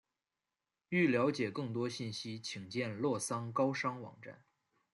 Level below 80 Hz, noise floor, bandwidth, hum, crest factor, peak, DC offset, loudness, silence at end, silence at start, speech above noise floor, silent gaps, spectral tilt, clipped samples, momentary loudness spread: -80 dBFS; under -90 dBFS; 12 kHz; none; 18 dB; -20 dBFS; under 0.1%; -36 LUFS; 0.6 s; 0.9 s; over 54 dB; none; -5 dB/octave; under 0.1%; 14 LU